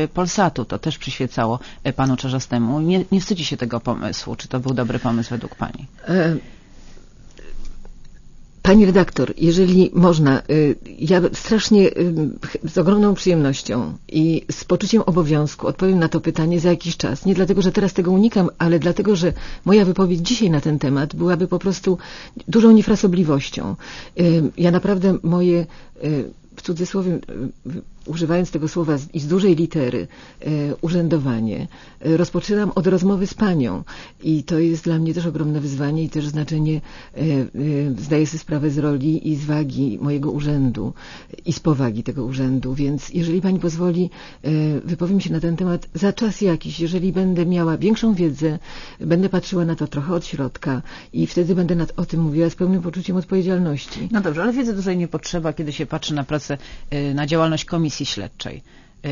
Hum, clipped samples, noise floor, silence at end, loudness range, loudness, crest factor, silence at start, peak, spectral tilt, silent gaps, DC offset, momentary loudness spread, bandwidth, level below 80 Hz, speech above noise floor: none; under 0.1%; -41 dBFS; 0 s; 6 LU; -19 LUFS; 18 dB; 0 s; 0 dBFS; -6.5 dB/octave; none; under 0.1%; 11 LU; 7.4 kHz; -40 dBFS; 22 dB